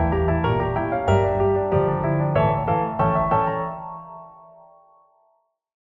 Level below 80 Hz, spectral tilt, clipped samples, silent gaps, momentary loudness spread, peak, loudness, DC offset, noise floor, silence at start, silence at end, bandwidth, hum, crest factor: -38 dBFS; -9 dB/octave; under 0.1%; none; 14 LU; -6 dBFS; -21 LUFS; under 0.1%; -66 dBFS; 0 s; 1.6 s; 7.4 kHz; none; 16 dB